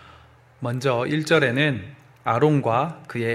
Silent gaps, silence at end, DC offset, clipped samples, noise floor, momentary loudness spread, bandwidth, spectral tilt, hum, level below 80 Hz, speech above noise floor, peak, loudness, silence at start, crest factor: none; 0 s; under 0.1%; under 0.1%; -51 dBFS; 13 LU; 13 kHz; -6.5 dB/octave; none; -62 dBFS; 29 dB; -4 dBFS; -22 LUFS; 0.6 s; 18 dB